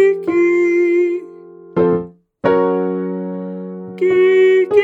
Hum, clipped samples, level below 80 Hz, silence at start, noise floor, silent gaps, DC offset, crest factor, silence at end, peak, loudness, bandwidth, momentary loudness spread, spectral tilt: none; under 0.1%; -54 dBFS; 0 s; -38 dBFS; none; under 0.1%; 14 dB; 0 s; 0 dBFS; -15 LUFS; 7.6 kHz; 14 LU; -8 dB/octave